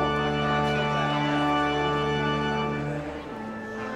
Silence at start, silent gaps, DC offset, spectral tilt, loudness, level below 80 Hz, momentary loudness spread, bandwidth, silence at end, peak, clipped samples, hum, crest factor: 0 s; none; under 0.1%; -6 dB/octave; -26 LUFS; -46 dBFS; 11 LU; 11 kHz; 0 s; -12 dBFS; under 0.1%; none; 14 dB